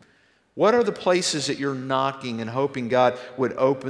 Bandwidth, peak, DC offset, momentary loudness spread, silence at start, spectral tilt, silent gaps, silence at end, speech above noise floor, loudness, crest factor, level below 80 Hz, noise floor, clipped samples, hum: 11 kHz; -6 dBFS; under 0.1%; 8 LU; 0.55 s; -4.5 dB/octave; none; 0 s; 38 dB; -23 LUFS; 18 dB; -66 dBFS; -61 dBFS; under 0.1%; none